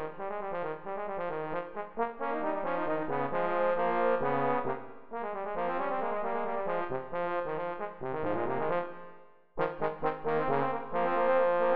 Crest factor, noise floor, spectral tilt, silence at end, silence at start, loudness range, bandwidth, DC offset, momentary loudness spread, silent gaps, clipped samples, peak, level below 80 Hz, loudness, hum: 16 dB; -54 dBFS; -5 dB/octave; 0 s; 0 s; 3 LU; 5 kHz; 0.9%; 9 LU; none; under 0.1%; -16 dBFS; -62 dBFS; -32 LUFS; none